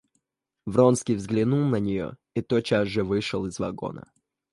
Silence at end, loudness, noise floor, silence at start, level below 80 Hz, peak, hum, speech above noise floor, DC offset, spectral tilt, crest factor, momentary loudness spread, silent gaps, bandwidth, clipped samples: 0.5 s; -25 LUFS; -81 dBFS; 0.65 s; -54 dBFS; -6 dBFS; none; 56 dB; under 0.1%; -6.5 dB/octave; 18 dB; 13 LU; none; 11.5 kHz; under 0.1%